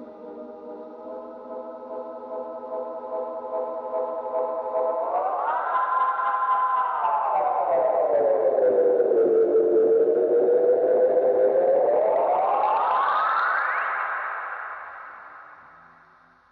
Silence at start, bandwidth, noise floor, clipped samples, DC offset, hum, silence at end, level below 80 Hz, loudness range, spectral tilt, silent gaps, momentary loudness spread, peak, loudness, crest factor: 0 s; 4.7 kHz; -56 dBFS; under 0.1%; under 0.1%; none; 1 s; -76 dBFS; 12 LU; -7.5 dB/octave; none; 18 LU; -12 dBFS; -23 LUFS; 12 dB